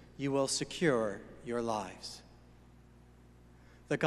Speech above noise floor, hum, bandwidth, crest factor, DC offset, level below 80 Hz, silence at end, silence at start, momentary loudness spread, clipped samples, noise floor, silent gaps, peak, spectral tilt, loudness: 24 dB; 60 Hz at -60 dBFS; 13 kHz; 22 dB; under 0.1%; -62 dBFS; 0 s; 0 s; 15 LU; under 0.1%; -59 dBFS; none; -14 dBFS; -4 dB/octave; -35 LUFS